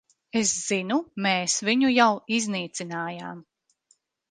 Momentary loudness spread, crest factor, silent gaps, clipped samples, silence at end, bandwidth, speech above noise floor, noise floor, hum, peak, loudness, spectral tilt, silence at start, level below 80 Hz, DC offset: 13 LU; 20 dB; none; under 0.1%; 0.9 s; 10 kHz; 42 dB; -67 dBFS; none; -6 dBFS; -24 LUFS; -3 dB/octave; 0.35 s; -70 dBFS; under 0.1%